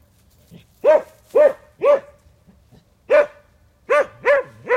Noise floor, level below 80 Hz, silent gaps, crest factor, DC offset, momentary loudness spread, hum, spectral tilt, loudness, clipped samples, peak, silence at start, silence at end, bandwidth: -54 dBFS; -60 dBFS; none; 16 dB; under 0.1%; 5 LU; none; -4.5 dB/octave; -18 LUFS; under 0.1%; -4 dBFS; 0.85 s; 0 s; 9.6 kHz